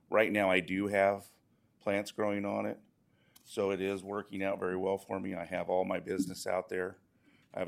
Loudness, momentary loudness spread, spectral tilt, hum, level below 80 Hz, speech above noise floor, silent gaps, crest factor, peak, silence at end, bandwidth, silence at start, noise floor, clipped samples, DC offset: -34 LUFS; 11 LU; -5.5 dB/octave; none; -78 dBFS; 33 dB; none; 22 dB; -12 dBFS; 0 s; 16 kHz; 0.1 s; -66 dBFS; under 0.1%; under 0.1%